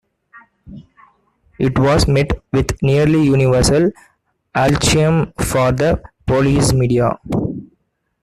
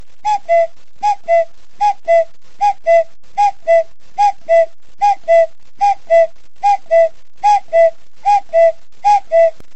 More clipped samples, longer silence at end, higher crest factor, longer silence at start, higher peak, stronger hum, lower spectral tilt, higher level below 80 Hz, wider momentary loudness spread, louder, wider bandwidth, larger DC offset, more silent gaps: neither; first, 0.55 s vs 0.25 s; about the same, 14 dB vs 12 dB; about the same, 0.35 s vs 0.25 s; about the same, -2 dBFS vs -2 dBFS; neither; first, -5.5 dB/octave vs -2 dB/octave; first, -32 dBFS vs -56 dBFS; about the same, 8 LU vs 7 LU; about the same, -15 LUFS vs -14 LUFS; first, 14 kHz vs 8.2 kHz; second, under 0.1% vs 6%; neither